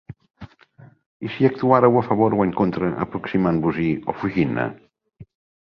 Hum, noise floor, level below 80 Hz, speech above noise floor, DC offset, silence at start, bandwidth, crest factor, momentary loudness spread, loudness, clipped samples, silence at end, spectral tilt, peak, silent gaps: none; -50 dBFS; -52 dBFS; 30 dB; under 0.1%; 0.1 s; 6.2 kHz; 20 dB; 11 LU; -20 LUFS; under 0.1%; 0.4 s; -10 dB/octave; -2 dBFS; 1.06-1.20 s